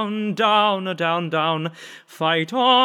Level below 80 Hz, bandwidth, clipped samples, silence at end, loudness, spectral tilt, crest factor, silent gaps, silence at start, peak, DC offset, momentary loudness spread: under -90 dBFS; 15.5 kHz; under 0.1%; 0 s; -20 LUFS; -5.5 dB/octave; 16 dB; none; 0 s; -4 dBFS; under 0.1%; 12 LU